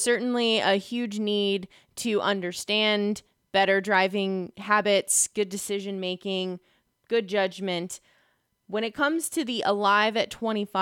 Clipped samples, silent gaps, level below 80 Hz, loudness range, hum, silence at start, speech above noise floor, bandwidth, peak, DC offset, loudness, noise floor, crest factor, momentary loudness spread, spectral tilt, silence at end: under 0.1%; none; -70 dBFS; 6 LU; none; 0 s; 43 dB; 17 kHz; -8 dBFS; under 0.1%; -25 LUFS; -69 dBFS; 18 dB; 10 LU; -3 dB/octave; 0 s